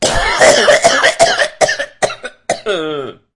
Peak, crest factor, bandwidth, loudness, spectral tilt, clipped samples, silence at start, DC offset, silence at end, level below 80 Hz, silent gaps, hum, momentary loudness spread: 0 dBFS; 12 dB; 12 kHz; -12 LUFS; -1.5 dB/octave; 0.2%; 0 s; under 0.1%; 0.25 s; -32 dBFS; none; none; 13 LU